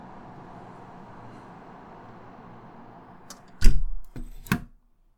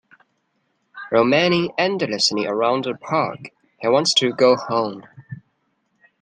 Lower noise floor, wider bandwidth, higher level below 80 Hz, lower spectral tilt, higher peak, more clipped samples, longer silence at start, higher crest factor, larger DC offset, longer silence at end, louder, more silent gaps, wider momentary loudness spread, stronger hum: second, -57 dBFS vs -69 dBFS; first, 17 kHz vs 10 kHz; first, -28 dBFS vs -66 dBFS; about the same, -5 dB/octave vs -4 dB/octave; about the same, 0 dBFS vs -2 dBFS; neither; first, 3.6 s vs 0.95 s; first, 24 dB vs 18 dB; neither; second, 0.55 s vs 0.8 s; second, -35 LUFS vs -19 LUFS; neither; second, 19 LU vs 23 LU; neither